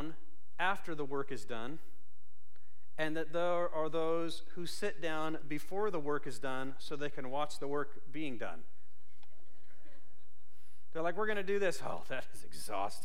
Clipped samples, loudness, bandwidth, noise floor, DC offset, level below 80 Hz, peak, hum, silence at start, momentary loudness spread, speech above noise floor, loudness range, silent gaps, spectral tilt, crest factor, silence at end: under 0.1%; -39 LUFS; 16 kHz; -72 dBFS; 3%; -70 dBFS; -18 dBFS; none; 0 s; 11 LU; 33 dB; 7 LU; none; -5 dB/octave; 20 dB; 0 s